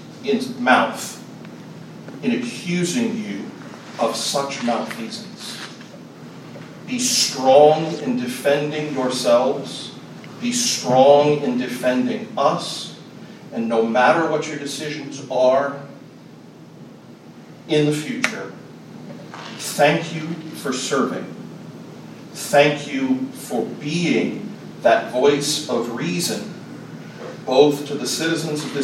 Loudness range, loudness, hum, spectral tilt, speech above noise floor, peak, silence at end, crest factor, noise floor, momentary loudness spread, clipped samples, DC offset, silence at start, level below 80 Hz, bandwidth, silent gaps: 7 LU; -20 LUFS; none; -4 dB/octave; 23 dB; 0 dBFS; 0 s; 22 dB; -42 dBFS; 22 LU; under 0.1%; under 0.1%; 0 s; -70 dBFS; 16 kHz; none